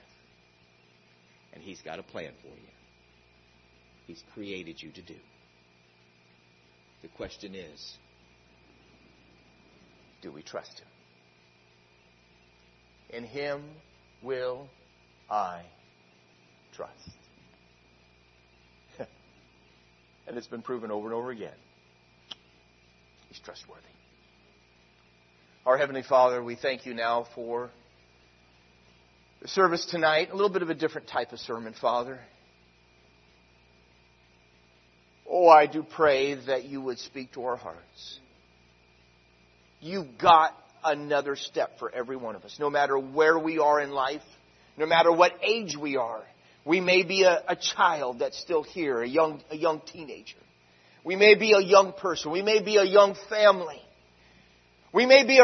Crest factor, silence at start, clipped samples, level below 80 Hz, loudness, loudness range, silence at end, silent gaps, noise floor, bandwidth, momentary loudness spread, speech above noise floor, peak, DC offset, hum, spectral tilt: 26 dB; 1.65 s; under 0.1%; -70 dBFS; -25 LUFS; 24 LU; 0 s; none; -62 dBFS; 6.4 kHz; 26 LU; 36 dB; -2 dBFS; under 0.1%; none; -3.5 dB/octave